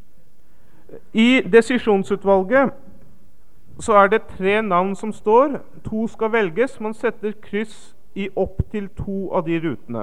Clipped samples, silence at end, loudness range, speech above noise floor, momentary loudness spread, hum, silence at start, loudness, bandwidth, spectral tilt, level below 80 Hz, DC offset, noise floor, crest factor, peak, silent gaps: under 0.1%; 0 s; 6 LU; 36 dB; 13 LU; none; 0.9 s; -19 LUFS; 11.5 kHz; -6 dB/octave; -44 dBFS; 2%; -55 dBFS; 20 dB; 0 dBFS; none